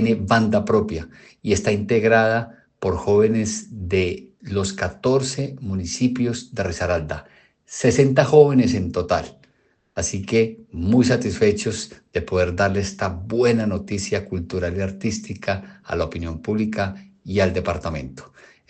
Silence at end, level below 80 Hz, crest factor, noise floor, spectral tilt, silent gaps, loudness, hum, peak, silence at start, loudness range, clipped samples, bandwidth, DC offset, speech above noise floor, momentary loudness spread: 0.45 s; -48 dBFS; 20 dB; -63 dBFS; -5.5 dB/octave; none; -21 LUFS; none; 0 dBFS; 0 s; 6 LU; under 0.1%; 9 kHz; under 0.1%; 43 dB; 12 LU